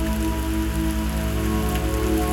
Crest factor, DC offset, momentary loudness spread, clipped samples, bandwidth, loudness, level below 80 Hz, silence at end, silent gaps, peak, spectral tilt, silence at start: 12 dB; 0.2%; 2 LU; under 0.1%; 18 kHz; -24 LUFS; -26 dBFS; 0 s; none; -10 dBFS; -5.5 dB/octave; 0 s